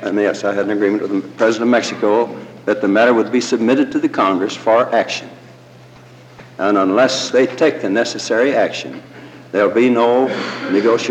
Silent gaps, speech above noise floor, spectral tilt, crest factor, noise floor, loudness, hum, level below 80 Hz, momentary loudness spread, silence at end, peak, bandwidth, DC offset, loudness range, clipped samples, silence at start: none; 26 dB; -4.5 dB/octave; 12 dB; -41 dBFS; -16 LUFS; none; -66 dBFS; 9 LU; 0 s; -4 dBFS; 9.4 kHz; under 0.1%; 2 LU; under 0.1%; 0 s